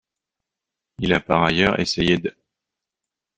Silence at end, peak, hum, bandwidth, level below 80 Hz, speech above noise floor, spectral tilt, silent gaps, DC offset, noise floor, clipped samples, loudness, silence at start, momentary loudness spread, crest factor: 1.05 s; -2 dBFS; none; 9.4 kHz; -46 dBFS; 66 dB; -5.5 dB/octave; none; under 0.1%; -86 dBFS; under 0.1%; -20 LUFS; 1 s; 8 LU; 22 dB